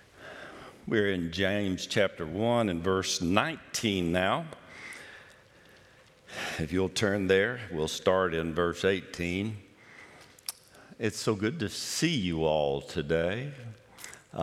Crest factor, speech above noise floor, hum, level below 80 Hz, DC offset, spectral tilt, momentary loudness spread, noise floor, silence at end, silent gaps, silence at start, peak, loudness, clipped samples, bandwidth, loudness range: 24 dB; 29 dB; none; -60 dBFS; under 0.1%; -4.5 dB/octave; 18 LU; -58 dBFS; 0 s; none; 0.15 s; -6 dBFS; -29 LUFS; under 0.1%; 16 kHz; 5 LU